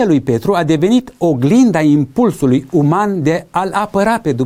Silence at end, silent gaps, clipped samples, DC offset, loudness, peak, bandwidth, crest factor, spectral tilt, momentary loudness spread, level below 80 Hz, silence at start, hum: 0 s; none; under 0.1%; under 0.1%; -13 LUFS; -2 dBFS; 15.5 kHz; 10 dB; -7 dB/octave; 6 LU; -46 dBFS; 0 s; none